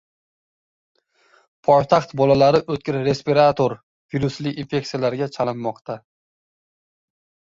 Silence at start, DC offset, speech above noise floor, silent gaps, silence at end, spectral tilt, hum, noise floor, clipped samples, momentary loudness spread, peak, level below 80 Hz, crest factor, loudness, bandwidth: 1.7 s; under 0.1%; 40 dB; 3.83-4.09 s, 5.81-5.85 s; 1.5 s; -6.5 dB/octave; none; -59 dBFS; under 0.1%; 13 LU; -2 dBFS; -54 dBFS; 20 dB; -20 LUFS; 7.6 kHz